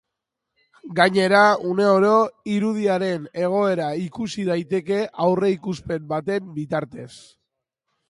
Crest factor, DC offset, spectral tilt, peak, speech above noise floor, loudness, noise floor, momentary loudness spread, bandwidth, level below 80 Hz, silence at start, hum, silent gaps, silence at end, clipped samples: 20 dB; under 0.1%; -6 dB/octave; -2 dBFS; 61 dB; -21 LUFS; -82 dBFS; 12 LU; 11.5 kHz; -60 dBFS; 0.85 s; none; none; 0.9 s; under 0.1%